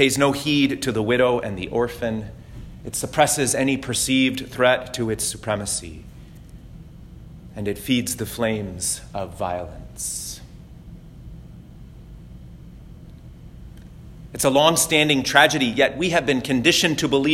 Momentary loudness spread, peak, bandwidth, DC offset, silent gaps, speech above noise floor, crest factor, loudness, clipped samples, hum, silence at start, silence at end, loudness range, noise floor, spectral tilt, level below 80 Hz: 21 LU; 0 dBFS; 16.5 kHz; under 0.1%; none; 21 dB; 22 dB; -21 LUFS; under 0.1%; none; 0 s; 0 s; 16 LU; -42 dBFS; -3.5 dB/octave; -44 dBFS